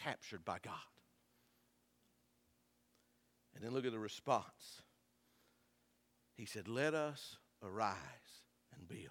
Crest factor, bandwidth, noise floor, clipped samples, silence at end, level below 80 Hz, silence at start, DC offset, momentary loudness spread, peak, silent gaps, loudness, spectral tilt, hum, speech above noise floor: 26 dB; 18 kHz; -78 dBFS; under 0.1%; 0 s; -82 dBFS; 0 s; under 0.1%; 21 LU; -22 dBFS; none; -44 LUFS; -4.5 dB/octave; 60 Hz at -80 dBFS; 34 dB